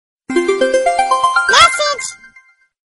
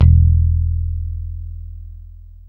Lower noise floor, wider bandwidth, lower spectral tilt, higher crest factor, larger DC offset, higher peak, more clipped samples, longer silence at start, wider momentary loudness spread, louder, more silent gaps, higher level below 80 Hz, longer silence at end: first, -48 dBFS vs -37 dBFS; first, 11.5 kHz vs 1.1 kHz; second, -1 dB/octave vs -11.5 dB/octave; about the same, 14 dB vs 16 dB; neither; about the same, 0 dBFS vs 0 dBFS; neither; first, 0.3 s vs 0 s; second, 11 LU vs 24 LU; first, -12 LUFS vs -17 LUFS; neither; second, -48 dBFS vs -22 dBFS; first, 0.8 s vs 0.3 s